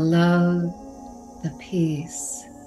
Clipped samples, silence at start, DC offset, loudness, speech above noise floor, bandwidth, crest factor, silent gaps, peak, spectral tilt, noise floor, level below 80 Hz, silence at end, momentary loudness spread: under 0.1%; 0 s; under 0.1%; -24 LUFS; 19 dB; 12.5 kHz; 16 dB; none; -8 dBFS; -6 dB/octave; -41 dBFS; -54 dBFS; 0 s; 22 LU